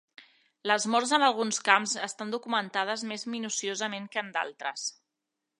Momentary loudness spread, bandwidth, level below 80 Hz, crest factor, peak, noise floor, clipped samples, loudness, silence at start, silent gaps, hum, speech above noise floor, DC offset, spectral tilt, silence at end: 11 LU; 11 kHz; -86 dBFS; 24 dB; -6 dBFS; -85 dBFS; under 0.1%; -29 LUFS; 0.2 s; none; none; 56 dB; under 0.1%; -1.5 dB/octave; 0.7 s